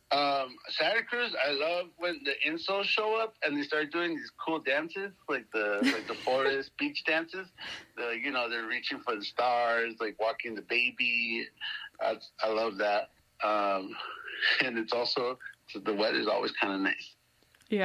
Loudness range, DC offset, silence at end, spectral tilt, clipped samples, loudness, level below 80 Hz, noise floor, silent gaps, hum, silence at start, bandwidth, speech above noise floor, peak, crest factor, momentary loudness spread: 2 LU; under 0.1%; 0 s; -4 dB/octave; under 0.1%; -31 LUFS; -76 dBFS; -65 dBFS; none; none; 0.1 s; 15 kHz; 34 dB; -12 dBFS; 20 dB; 10 LU